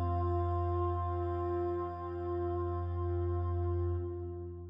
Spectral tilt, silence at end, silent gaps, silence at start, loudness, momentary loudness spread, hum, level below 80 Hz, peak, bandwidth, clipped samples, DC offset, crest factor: -11.5 dB/octave; 0 s; none; 0 s; -35 LUFS; 6 LU; none; -46 dBFS; -24 dBFS; 3.7 kHz; under 0.1%; under 0.1%; 10 dB